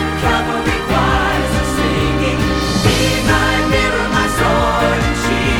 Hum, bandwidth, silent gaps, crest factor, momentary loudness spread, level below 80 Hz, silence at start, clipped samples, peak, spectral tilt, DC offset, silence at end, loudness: none; 19.5 kHz; none; 14 dB; 3 LU; -24 dBFS; 0 s; under 0.1%; 0 dBFS; -4.5 dB/octave; under 0.1%; 0 s; -15 LUFS